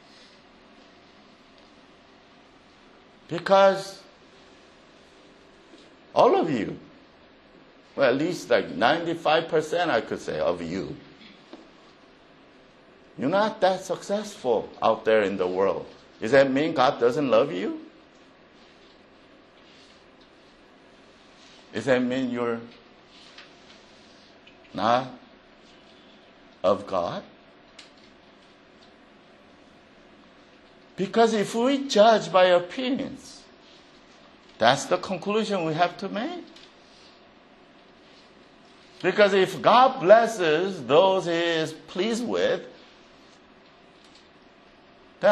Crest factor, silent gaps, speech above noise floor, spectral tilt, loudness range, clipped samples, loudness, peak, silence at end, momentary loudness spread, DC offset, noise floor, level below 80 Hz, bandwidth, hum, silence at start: 24 dB; none; 31 dB; -4.5 dB/octave; 11 LU; under 0.1%; -23 LUFS; -2 dBFS; 0 s; 16 LU; under 0.1%; -54 dBFS; -66 dBFS; 12 kHz; none; 3.3 s